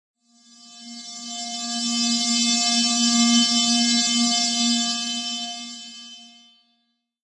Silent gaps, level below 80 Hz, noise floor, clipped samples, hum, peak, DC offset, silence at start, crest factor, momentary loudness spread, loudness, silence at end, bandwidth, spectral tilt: none; -76 dBFS; -71 dBFS; under 0.1%; none; -6 dBFS; under 0.1%; 0.65 s; 18 dB; 19 LU; -19 LUFS; 1.05 s; 11.5 kHz; -0.5 dB/octave